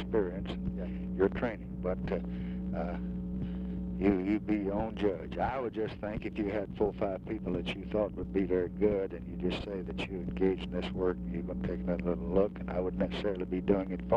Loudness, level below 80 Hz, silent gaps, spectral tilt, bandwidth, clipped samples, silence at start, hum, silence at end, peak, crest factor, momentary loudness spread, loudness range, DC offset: -34 LUFS; -46 dBFS; none; -9 dB/octave; 7.4 kHz; under 0.1%; 0 s; none; 0 s; -14 dBFS; 20 dB; 7 LU; 2 LU; under 0.1%